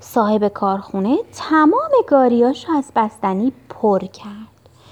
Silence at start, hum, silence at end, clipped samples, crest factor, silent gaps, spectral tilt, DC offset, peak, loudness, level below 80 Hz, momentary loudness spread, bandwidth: 0.1 s; none; 0.45 s; under 0.1%; 16 dB; none; -6.5 dB/octave; under 0.1%; 0 dBFS; -17 LUFS; -58 dBFS; 8 LU; 14 kHz